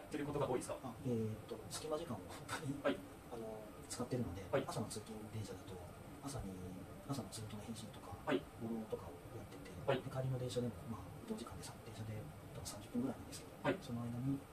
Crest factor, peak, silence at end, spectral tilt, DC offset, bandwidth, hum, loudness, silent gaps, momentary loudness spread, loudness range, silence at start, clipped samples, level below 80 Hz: 22 dB; -22 dBFS; 0 s; -5.5 dB/octave; under 0.1%; 14.5 kHz; none; -45 LUFS; none; 10 LU; 3 LU; 0 s; under 0.1%; -64 dBFS